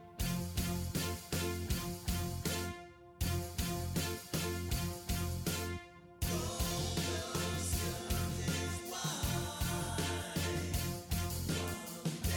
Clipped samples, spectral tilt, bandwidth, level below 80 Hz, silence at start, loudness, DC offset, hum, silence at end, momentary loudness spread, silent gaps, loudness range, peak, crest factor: under 0.1%; -4 dB/octave; 19.5 kHz; -46 dBFS; 0 s; -38 LUFS; under 0.1%; none; 0 s; 3 LU; none; 2 LU; -22 dBFS; 14 dB